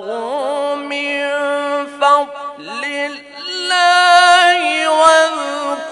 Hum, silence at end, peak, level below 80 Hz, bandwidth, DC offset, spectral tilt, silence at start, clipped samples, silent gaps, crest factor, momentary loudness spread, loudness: none; 0 s; 0 dBFS; -64 dBFS; 11 kHz; under 0.1%; 0 dB/octave; 0 s; under 0.1%; none; 14 dB; 15 LU; -14 LUFS